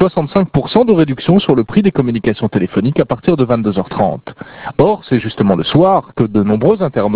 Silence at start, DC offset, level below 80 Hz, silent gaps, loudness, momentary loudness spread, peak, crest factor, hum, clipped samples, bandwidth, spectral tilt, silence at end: 0 s; 0.3%; -42 dBFS; none; -13 LUFS; 6 LU; 0 dBFS; 12 dB; none; 0.2%; 4 kHz; -11.5 dB/octave; 0 s